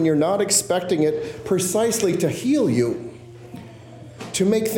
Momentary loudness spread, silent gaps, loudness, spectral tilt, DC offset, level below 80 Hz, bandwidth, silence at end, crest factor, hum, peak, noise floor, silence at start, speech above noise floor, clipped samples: 21 LU; none; -21 LUFS; -4.5 dB/octave; under 0.1%; -58 dBFS; 17 kHz; 0 s; 16 dB; none; -4 dBFS; -41 dBFS; 0 s; 21 dB; under 0.1%